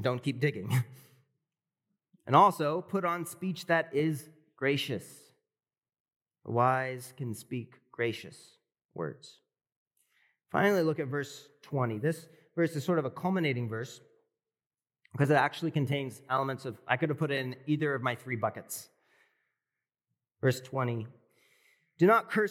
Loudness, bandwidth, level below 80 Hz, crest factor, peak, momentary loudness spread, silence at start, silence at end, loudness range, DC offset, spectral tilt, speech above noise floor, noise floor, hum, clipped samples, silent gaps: -31 LUFS; 17 kHz; -88 dBFS; 24 dB; -8 dBFS; 15 LU; 0 s; 0 s; 7 LU; under 0.1%; -6 dB/octave; over 60 dB; under -90 dBFS; none; under 0.1%; 6.00-6.05 s, 6.16-6.20 s, 8.85-8.89 s, 9.76-9.91 s, 14.66-14.70 s